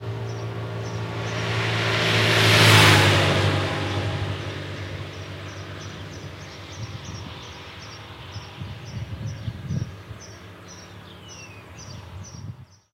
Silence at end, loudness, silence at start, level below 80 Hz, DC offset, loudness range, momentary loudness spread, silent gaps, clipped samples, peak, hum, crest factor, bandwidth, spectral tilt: 0.3 s; -20 LUFS; 0 s; -48 dBFS; under 0.1%; 19 LU; 24 LU; none; under 0.1%; 0 dBFS; none; 24 dB; 16 kHz; -4 dB/octave